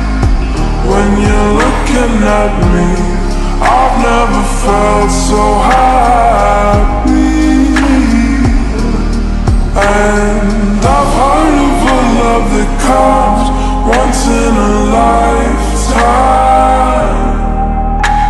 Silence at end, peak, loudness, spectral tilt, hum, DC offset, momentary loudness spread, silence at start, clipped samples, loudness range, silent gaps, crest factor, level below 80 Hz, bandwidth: 0 s; 0 dBFS; -10 LUFS; -5.5 dB/octave; none; under 0.1%; 6 LU; 0 s; 0.1%; 2 LU; none; 8 dB; -14 dBFS; 12 kHz